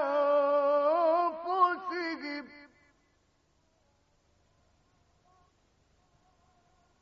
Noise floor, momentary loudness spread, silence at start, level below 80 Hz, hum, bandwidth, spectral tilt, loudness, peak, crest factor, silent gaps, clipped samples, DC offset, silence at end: -71 dBFS; 13 LU; 0 s; -76 dBFS; none; 6.2 kHz; -5 dB/octave; -28 LUFS; -14 dBFS; 18 dB; none; under 0.1%; under 0.1%; 4.35 s